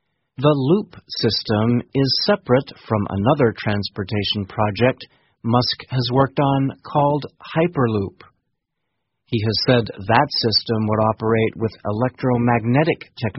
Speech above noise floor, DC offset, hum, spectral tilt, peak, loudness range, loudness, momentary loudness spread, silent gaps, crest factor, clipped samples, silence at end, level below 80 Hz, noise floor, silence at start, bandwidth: 58 dB; under 0.1%; none; -5 dB/octave; 0 dBFS; 3 LU; -20 LUFS; 7 LU; none; 20 dB; under 0.1%; 0 s; -50 dBFS; -77 dBFS; 0.4 s; 6 kHz